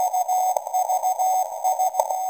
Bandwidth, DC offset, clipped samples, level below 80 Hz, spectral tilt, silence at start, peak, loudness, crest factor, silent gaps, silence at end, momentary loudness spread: 17 kHz; under 0.1%; under 0.1%; -76 dBFS; 1.5 dB/octave; 0 s; -4 dBFS; -22 LUFS; 18 dB; none; 0 s; 2 LU